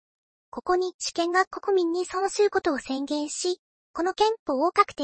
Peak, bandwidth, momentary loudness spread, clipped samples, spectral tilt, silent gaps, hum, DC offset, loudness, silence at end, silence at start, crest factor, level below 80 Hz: -6 dBFS; 8.8 kHz; 7 LU; under 0.1%; -2 dB/octave; 0.94-0.99 s, 1.47-1.51 s, 3.59-3.94 s, 4.39-4.46 s; none; under 0.1%; -26 LUFS; 0 s; 0.55 s; 20 dB; -62 dBFS